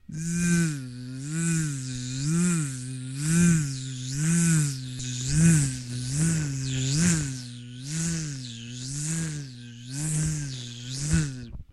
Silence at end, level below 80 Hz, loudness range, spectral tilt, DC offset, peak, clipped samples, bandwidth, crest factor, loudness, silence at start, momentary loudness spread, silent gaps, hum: 0.1 s; -46 dBFS; 7 LU; -4.5 dB/octave; under 0.1%; -10 dBFS; under 0.1%; 12.5 kHz; 18 dB; -27 LUFS; 0.1 s; 14 LU; none; none